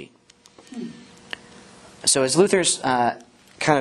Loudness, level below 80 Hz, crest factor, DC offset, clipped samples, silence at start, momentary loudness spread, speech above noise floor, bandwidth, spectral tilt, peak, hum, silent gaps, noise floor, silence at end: -20 LUFS; -62 dBFS; 22 dB; under 0.1%; under 0.1%; 0 s; 20 LU; 34 dB; 12.5 kHz; -3 dB/octave; -2 dBFS; none; none; -54 dBFS; 0 s